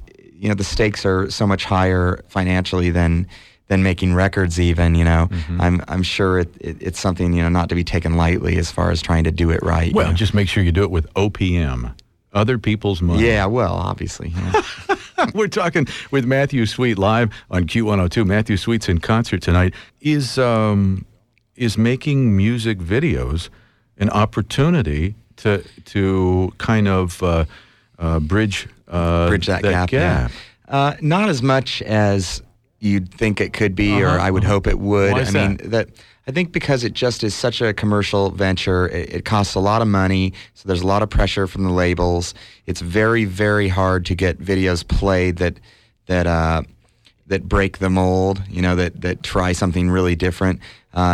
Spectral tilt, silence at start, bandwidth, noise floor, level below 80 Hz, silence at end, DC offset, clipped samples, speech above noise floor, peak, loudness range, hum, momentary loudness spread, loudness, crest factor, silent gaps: -6.5 dB/octave; 0 s; 12.5 kHz; -55 dBFS; -30 dBFS; 0 s; under 0.1%; under 0.1%; 38 dB; -4 dBFS; 2 LU; none; 7 LU; -19 LUFS; 14 dB; none